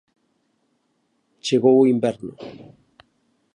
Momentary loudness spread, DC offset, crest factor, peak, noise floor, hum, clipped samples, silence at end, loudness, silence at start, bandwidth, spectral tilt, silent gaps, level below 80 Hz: 23 LU; under 0.1%; 18 dB; -4 dBFS; -69 dBFS; none; under 0.1%; 1 s; -18 LUFS; 1.45 s; 10.5 kHz; -6 dB/octave; none; -68 dBFS